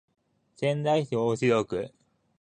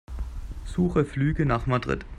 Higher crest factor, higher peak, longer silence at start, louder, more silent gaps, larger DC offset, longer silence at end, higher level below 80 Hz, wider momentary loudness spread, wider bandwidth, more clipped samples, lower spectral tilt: about the same, 18 dB vs 18 dB; about the same, -10 dBFS vs -8 dBFS; first, 0.6 s vs 0.1 s; about the same, -27 LUFS vs -26 LUFS; neither; neither; first, 0.5 s vs 0 s; second, -64 dBFS vs -36 dBFS; second, 9 LU vs 13 LU; about the same, 9.8 kHz vs 10.5 kHz; neither; second, -6.5 dB/octave vs -8 dB/octave